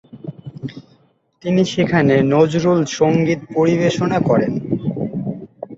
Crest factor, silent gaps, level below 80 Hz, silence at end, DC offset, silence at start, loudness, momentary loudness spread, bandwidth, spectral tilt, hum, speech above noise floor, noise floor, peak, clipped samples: 16 dB; none; -52 dBFS; 0 s; under 0.1%; 0.15 s; -17 LUFS; 18 LU; 8 kHz; -6.5 dB/octave; none; 41 dB; -56 dBFS; -2 dBFS; under 0.1%